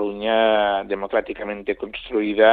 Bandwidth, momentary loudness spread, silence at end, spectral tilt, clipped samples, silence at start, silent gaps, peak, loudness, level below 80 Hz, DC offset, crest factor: 4.5 kHz; 11 LU; 0 s; -7.5 dB/octave; under 0.1%; 0 s; none; -2 dBFS; -22 LUFS; -52 dBFS; under 0.1%; 18 dB